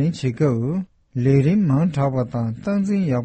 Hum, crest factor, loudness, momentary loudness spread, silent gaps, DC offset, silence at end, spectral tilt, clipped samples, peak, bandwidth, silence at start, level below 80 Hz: none; 14 dB; -20 LUFS; 8 LU; none; under 0.1%; 0 s; -9 dB/octave; under 0.1%; -6 dBFS; 8.6 kHz; 0 s; -50 dBFS